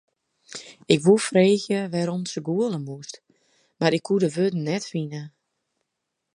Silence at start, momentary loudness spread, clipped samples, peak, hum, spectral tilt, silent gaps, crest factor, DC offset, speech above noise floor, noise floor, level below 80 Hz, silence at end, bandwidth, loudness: 0.5 s; 20 LU; under 0.1%; -2 dBFS; none; -5.5 dB/octave; none; 22 dB; under 0.1%; 58 dB; -81 dBFS; -70 dBFS; 1.1 s; 11 kHz; -23 LUFS